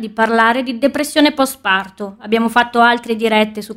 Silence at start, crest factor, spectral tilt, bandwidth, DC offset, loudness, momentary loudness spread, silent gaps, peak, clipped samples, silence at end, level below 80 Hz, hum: 0 s; 14 dB; -3.5 dB/octave; 16 kHz; under 0.1%; -14 LUFS; 5 LU; none; -2 dBFS; under 0.1%; 0 s; -54 dBFS; none